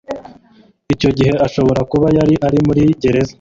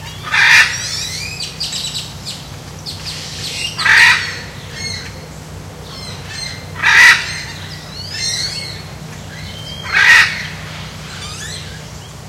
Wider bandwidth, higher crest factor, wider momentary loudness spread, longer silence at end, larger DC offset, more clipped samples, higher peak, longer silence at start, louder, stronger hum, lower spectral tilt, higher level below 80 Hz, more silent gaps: second, 7.6 kHz vs 18.5 kHz; about the same, 12 dB vs 16 dB; second, 6 LU vs 23 LU; about the same, 0.1 s vs 0 s; neither; second, under 0.1% vs 0.1%; about the same, -2 dBFS vs 0 dBFS; about the same, 0.1 s vs 0 s; about the same, -14 LUFS vs -12 LUFS; neither; first, -7.5 dB/octave vs -1 dB/octave; first, -36 dBFS vs -42 dBFS; neither